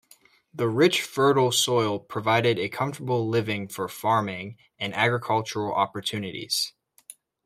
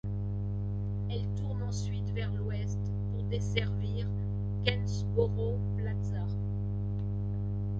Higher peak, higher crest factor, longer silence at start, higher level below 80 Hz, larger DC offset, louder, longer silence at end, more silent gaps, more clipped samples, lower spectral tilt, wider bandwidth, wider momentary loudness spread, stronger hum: first, -6 dBFS vs -12 dBFS; about the same, 20 dB vs 20 dB; first, 0.55 s vs 0.05 s; second, -68 dBFS vs -42 dBFS; neither; first, -25 LUFS vs -34 LUFS; first, 0.75 s vs 0 s; neither; neither; second, -4 dB/octave vs -7 dB/octave; first, 16 kHz vs 7.6 kHz; first, 11 LU vs 4 LU; second, none vs 50 Hz at -30 dBFS